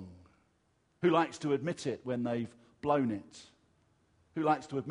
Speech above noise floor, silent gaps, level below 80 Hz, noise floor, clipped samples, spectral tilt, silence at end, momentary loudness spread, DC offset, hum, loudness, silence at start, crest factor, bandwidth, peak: 41 dB; none; -72 dBFS; -73 dBFS; under 0.1%; -6.5 dB/octave; 0 s; 15 LU; under 0.1%; none; -33 LUFS; 0 s; 20 dB; 10.5 kHz; -16 dBFS